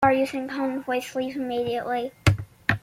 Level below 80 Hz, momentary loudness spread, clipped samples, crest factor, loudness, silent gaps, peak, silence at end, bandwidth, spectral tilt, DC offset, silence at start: -48 dBFS; 5 LU; under 0.1%; 22 dB; -26 LUFS; none; -4 dBFS; 0.05 s; 16.5 kHz; -6 dB/octave; under 0.1%; 0 s